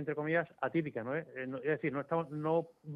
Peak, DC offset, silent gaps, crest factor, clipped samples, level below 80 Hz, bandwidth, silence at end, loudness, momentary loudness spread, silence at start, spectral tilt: -20 dBFS; under 0.1%; none; 16 dB; under 0.1%; -78 dBFS; 4.9 kHz; 0 s; -36 LUFS; 5 LU; 0 s; -9.5 dB/octave